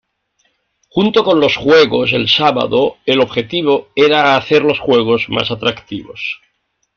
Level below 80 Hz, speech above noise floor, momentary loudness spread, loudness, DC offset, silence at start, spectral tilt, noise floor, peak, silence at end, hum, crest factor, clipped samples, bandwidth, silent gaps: -50 dBFS; 50 dB; 13 LU; -13 LUFS; under 0.1%; 0.95 s; -5.5 dB/octave; -63 dBFS; 0 dBFS; 0.6 s; none; 14 dB; under 0.1%; 6.8 kHz; none